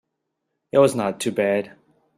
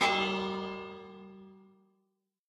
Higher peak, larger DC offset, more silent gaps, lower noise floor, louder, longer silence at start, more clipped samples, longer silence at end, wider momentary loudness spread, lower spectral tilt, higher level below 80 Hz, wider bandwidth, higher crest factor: first, -4 dBFS vs -14 dBFS; neither; neither; about the same, -78 dBFS vs -80 dBFS; first, -21 LUFS vs -33 LUFS; first, 0.75 s vs 0 s; neither; second, 0.5 s vs 0.85 s; second, 8 LU vs 24 LU; about the same, -5 dB/octave vs -4 dB/octave; about the same, -64 dBFS vs -68 dBFS; first, 15.5 kHz vs 13 kHz; about the same, 20 dB vs 22 dB